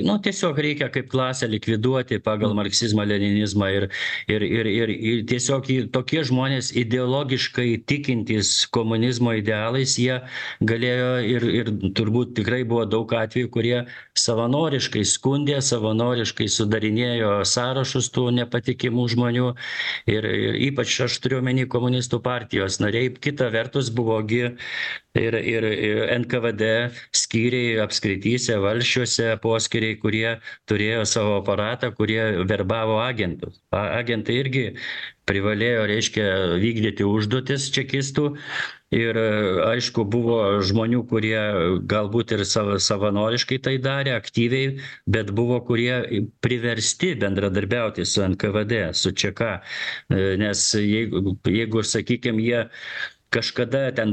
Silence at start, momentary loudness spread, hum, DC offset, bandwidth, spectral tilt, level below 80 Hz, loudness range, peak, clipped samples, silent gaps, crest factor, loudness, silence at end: 0 s; 4 LU; none; under 0.1%; 9.4 kHz; -4.5 dB/octave; -54 dBFS; 2 LU; -4 dBFS; under 0.1%; none; 18 dB; -22 LUFS; 0 s